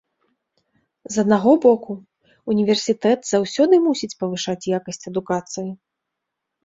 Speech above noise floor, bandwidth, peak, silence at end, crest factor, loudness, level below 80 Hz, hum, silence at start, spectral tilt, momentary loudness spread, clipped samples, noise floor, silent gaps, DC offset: 62 dB; 8 kHz; -2 dBFS; 0.9 s; 18 dB; -20 LUFS; -64 dBFS; none; 1.1 s; -5 dB/octave; 15 LU; under 0.1%; -81 dBFS; none; under 0.1%